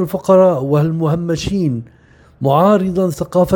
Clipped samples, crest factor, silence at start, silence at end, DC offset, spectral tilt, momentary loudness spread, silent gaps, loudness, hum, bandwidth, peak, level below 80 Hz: under 0.1%; 14 dB; 0 s; 0 s; under 0.1%; -7.5 dB/octave; 8 LU; none; -15 LUFS; none; 17.5 kHz; 0 dBFS; -42 dBFS